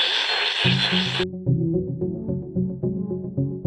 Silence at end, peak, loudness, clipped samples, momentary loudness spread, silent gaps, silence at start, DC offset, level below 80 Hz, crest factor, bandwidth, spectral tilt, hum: 0 s; -6 dBFS; -23 LUFS; under 0.1%; 9 LU; none; 0 s; under 0.1%; -48 dBFS; 18 dB; 10 kHz; -5.5 dB/octave; none